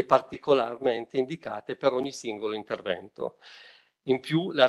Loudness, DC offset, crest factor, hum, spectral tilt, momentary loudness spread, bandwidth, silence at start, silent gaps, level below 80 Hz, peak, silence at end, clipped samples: -29 LUFS; under 0.1%; 22 dB; none; -5.5 dB/octave; 12 LU; 12 kHz; 0 s; none; -72 dBFS; -6 dBFS; 0 s; under 0.1%